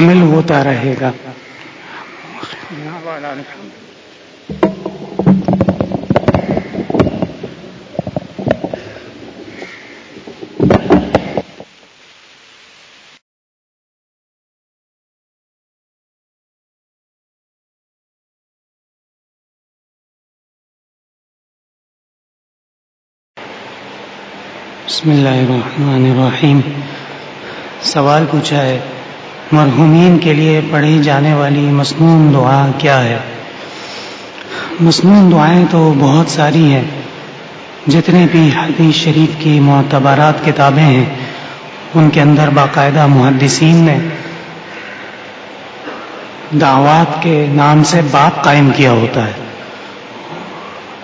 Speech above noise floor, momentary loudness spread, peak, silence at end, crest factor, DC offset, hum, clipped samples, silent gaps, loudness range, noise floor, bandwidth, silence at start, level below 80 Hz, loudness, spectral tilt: 34 dB; 21 LU; 0 dBFS; 0 s; 12 dB; under 0.1%; none; 0.1%; 13.22-23.34 s; 11 LU; -43 dBFS; 8 kHz; 0 s; -44 dBFS; -10 LUFS; -6.5 dB/octave